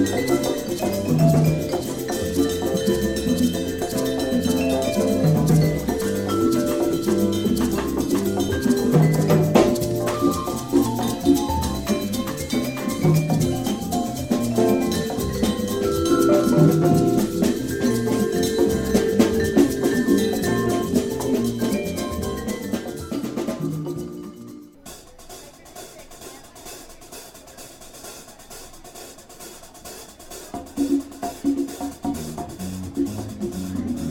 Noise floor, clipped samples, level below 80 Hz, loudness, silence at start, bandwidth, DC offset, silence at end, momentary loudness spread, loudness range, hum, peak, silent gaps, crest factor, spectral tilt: -42 dBFS; under 0.1%; -42 dBFS; -22 LUFS; 0 s; 17 kHz; under 0.1%; 0 s; 22 LU; 20 LU; none; -2 dBFS; none; 20 dB; -6 dB/octave